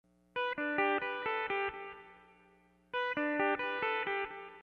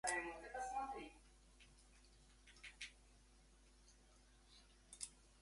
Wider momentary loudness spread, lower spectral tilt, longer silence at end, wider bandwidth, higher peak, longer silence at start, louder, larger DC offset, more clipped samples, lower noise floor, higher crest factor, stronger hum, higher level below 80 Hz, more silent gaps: second, 11 LU vs 22 LU; first, -5.5 dB/octave vs -1.5 dB/octave; about the same, 0 s vs 0 s; second, 6.8 kHz vs 11.5 kHz; first, -18 dBFS vs -26 dBFS; first, 0.35 s vs 0.05 s; first, -35 LUFS vs -50 LUFS; neither; neither; about the same, -67 dBFS vs -69 dBFS; second, 18 dB vs 26 dB; first, 60 Hz at -70 dBFS vs none; about the same, -72 dBFS vs -70 dBFS; neither